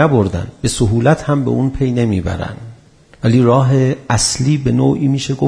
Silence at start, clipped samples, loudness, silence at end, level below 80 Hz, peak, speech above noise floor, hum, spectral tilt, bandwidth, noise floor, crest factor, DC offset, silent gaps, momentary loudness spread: 0 s; under 0.1%; -15 LUFS; 0 s; -34 dBFS; 0 dBFS; 30 dB; none; -6 dB/octave; 11 kHz; -44 dBFS; 14 dB; under 0.1%; none; 8 LU